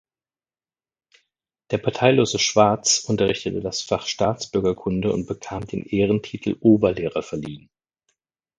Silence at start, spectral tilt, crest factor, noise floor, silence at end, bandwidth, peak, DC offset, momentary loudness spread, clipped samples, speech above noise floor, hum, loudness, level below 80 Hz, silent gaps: 1.7 s; -4.5 dB/octave; 22 dB; under -90 dBFS; 1 s; 10 kHz; 0 dBFS; under 0.1%; 13 LU; under 0.1%; over 69 dB; none; -21 LUFS; -50 dBFS; none